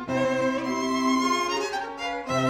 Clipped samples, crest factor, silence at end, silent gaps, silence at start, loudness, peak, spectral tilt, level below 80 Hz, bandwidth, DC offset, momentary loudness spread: under 0.1%; 14 dB; 0 s; none; 0 s; -26 LUFS; -12 dBFS; -4 dB/octave; -58 dBFS; 15.5 kHz; under 0.1%; 7 LU